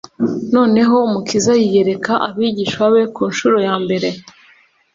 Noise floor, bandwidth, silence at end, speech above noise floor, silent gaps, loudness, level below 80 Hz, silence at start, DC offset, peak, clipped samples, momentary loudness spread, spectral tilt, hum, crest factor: -51 dBFS; 7.8 kHz; 0.75 s; 36 dB; none; -15 LUFS; -56 dBFS; 0.2 s; under 0.1%; -2 dBFS; under 0.1%; 7 LU; -5 dB/octave; none; 12 dB